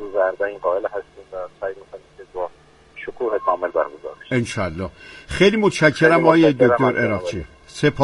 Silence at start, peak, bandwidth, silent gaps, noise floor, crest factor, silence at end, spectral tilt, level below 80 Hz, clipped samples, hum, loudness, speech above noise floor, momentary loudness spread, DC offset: 0 s; 0 dBFS; 11.5 kHz; none; -48 dBFS; 20 dB; 0 s; -6 dB/octave; -46 dBFS; under 0.1%; none; -19 LUFS; 30 dB; 20 LU; under 0.1%